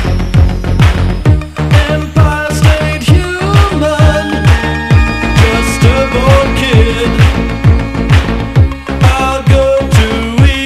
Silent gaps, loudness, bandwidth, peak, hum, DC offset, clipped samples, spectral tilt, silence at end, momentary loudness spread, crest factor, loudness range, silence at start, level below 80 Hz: none; -10 LUFS; 14 kHz; 0 dBFS; none; under 0.1%; 1%; -6 dB/octave; 0 s; 3 LU; 8 dB; 1 LU; 0 s; -14 dBFS